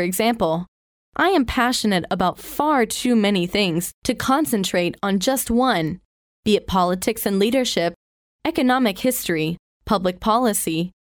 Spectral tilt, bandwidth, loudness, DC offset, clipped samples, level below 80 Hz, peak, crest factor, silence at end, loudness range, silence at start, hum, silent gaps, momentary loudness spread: -4 dB/octave; over 20 kHz; -20 LUFS; under 0.1%; under 0.1%; -46 dBFS; -4 dBFS; 16 dB; 0.15 s; 1 LU; 0 s; none; 0.68-1.12 s, 3.94-4.02 s, 6.05-6.43 s, 7.96-8.39 s, 9.59-9.80 s; 7 LU